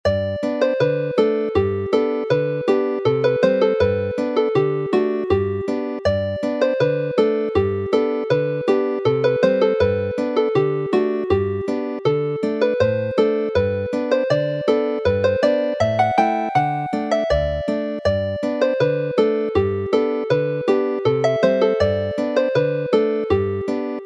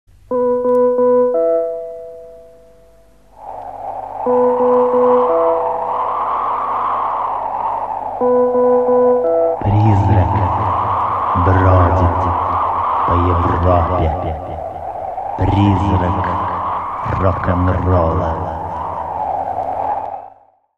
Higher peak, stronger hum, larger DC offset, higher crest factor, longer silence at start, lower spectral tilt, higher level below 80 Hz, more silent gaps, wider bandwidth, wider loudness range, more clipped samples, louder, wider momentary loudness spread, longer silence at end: about the same, -2 dBFS vs 0 dBFS; neither; second, under 0.1% vs 0.3%; about the same, 16 dB vs 16 dB; second, 0.05 s vs 0.3 s; second, -7.5 dB/octave vs -9.5 dB/octave; second, -44 dBFS vs -32 dBFS; neither; first, 8.6 kHz vs 5.6 kHz; second, 1 LU vs 4 LU; neither; second, -20 LUFS vs -16 LUFS; second, 5 LU vs 12 LU; second, 0 s vs 0.5 s